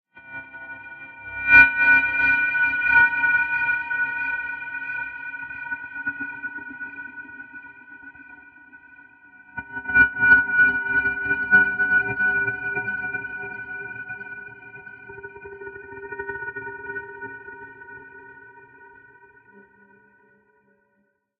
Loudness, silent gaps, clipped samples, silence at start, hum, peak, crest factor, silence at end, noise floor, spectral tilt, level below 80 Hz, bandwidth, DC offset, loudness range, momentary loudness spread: -20 LUFS; none; under 0.1%; 0.15 s; none; 0 dBFS; 24 dB; 2.55 s; -70 dBFS; -6 dB/octave; -54 dBFS; 5.6 kHz; under 0.1%; 20 LU; 24 LU